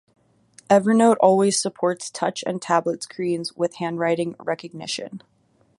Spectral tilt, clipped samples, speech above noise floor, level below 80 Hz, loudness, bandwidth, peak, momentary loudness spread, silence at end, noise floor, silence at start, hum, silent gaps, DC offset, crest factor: -4.5 dB/octave; under 0.1%; 33 dB; -70 dBFS; -22 LUFS; 11.5 kHz; -2 dBFS; 13 LU; 0.6 s; -54 dBFS; 0.7 s; none; none; under 0.1%; 20 dB